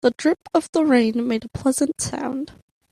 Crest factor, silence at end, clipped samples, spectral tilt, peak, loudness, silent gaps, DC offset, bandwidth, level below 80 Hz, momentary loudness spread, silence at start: 16 dB; 0.4 s; under 0.1%; -4.5 dB/octave; -6 dBFS; -21 LUFS; 0.69-0.73 s; under 0.1%; 13 kHz; -54 dBFS; 10 LU; 0.05 s